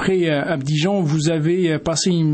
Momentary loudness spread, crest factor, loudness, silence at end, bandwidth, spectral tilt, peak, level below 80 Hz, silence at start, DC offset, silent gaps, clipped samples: 2 LU; 12 dB; -19 LUFS; 0 s; 8.8 kHz; -5.5 dB/octave; -6 dBFS; -50 dBFS; 0 s; under 0.1%; none; under 0.1%